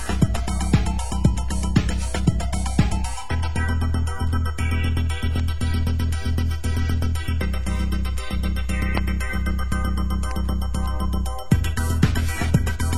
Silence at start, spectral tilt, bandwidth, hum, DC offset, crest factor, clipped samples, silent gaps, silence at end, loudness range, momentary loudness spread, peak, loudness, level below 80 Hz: 0 s; -6 dB/octave; 13 kHz; none; 3%; 18 dB; under 0.1%; none; 0 s; 2 LU; 4 LU; -4 dBFS; -24 LUFS; -24 dBFS